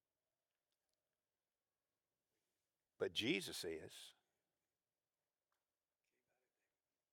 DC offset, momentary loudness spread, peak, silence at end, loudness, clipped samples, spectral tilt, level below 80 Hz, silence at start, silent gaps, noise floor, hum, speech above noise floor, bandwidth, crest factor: under 0.1%; 18 LU; -26 dBFS; 3 s; -44 LUFS; under 0.1%; -3.5 dB/octave; under -90 dBFS; 3 s; none; under -90 dBFS; none; over 45 dB; 17.5 kHz; 26 dB